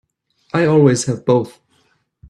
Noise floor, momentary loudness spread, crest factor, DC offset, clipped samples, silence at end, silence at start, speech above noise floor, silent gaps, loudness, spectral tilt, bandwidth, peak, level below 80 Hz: -61 dBFS; 10 LU; 18 dB; under 0.1%; under 0.1%; 0.8 s; 0.55 s; 47 dB; none; -15 LUFS; -6 dB/octave; 12 kHz; 0 dBFS; -56 dBFS